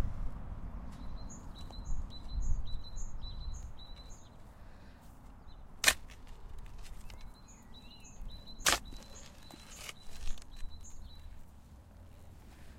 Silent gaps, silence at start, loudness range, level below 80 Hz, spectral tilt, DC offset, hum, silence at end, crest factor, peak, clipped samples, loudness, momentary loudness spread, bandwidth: none; 0 s; 13 LU; -44 dBFS; -1.5 dB/octave; under 0.1%; none; 0 s; 30 dB; -8 dBFS; under 0.1%; -38 LUFS; 26 LU; 16 kHz